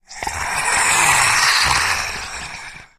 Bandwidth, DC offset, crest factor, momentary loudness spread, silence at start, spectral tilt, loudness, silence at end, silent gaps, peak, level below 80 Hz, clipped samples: 15.5 kHz; under 0.1%; 18 dB; 16 LU; 0.1 s; 0 dB/octave; -15 LUFS; 0.15 s; none; 0 dBFS; -40 dBFS; under 0.1%